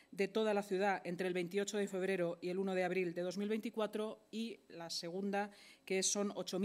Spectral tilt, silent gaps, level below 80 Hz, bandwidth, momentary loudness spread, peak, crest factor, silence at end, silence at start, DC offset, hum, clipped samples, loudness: -4 dB/octave; none; under -90 dBFS; 15.5 kHz; 9 LU; -22 dBFS; 18 dB; 0 s; 0.1 s; under 0.1%; none; under 0.1%; -39 LUFS